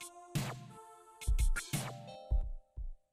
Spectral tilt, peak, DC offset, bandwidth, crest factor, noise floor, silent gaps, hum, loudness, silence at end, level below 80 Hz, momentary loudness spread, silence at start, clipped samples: -4.5 dB/octave; -22 dBFS; under 0.1%; 15.5 kHz; 14 dB; -56 dBFS; none; none; -40 LUFS; 0.15 s; -38 dBFS; 16 LU; 0 s; under 0.1%